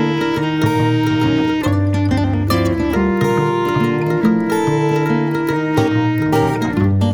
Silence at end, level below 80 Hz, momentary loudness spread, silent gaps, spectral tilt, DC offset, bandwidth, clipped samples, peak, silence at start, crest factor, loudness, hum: 0 s; -38 dBFS; 2 LU; none; -7 dB/octave; 0.2%; 19 kHz; under 0.1%; -2 dBFS; 0 s; 14 dB; -16 LUFS; none